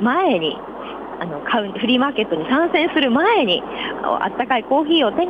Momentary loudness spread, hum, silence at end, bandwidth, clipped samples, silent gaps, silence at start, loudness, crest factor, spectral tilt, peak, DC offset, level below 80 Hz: 13 LU; none; 0 s; 5 kHz; under 0.1%; none; 0 s; -18 LUFS; 14 dB; -7 dB/octave; -6 dBFS; under 0.1%; -54 dBFS